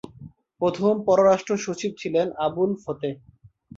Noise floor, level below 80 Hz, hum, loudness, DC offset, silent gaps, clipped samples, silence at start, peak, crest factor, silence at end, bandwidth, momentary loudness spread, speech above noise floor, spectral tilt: -46 dBFS; -62 dBFS; none; -23 LUFS; under 0.1%; none; under 0.1%; 0.05 s; -6 dBFS; 18 dB; 0.6 s; 7.8 kHz; 13 LU; 23 dB; -6 dB/octave